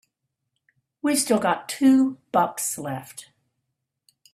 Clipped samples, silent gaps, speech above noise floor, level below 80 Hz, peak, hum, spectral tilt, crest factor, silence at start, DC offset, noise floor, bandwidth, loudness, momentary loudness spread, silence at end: under 0.1%; none; 58 dB; -70 dBFS; -6 dBFS; none; -4 dB/octave; 18 dB; 1.05 s; under 0.1%; -80 dBFS; 15 kHz; -22 LUFS; 15 LU; 1.1 s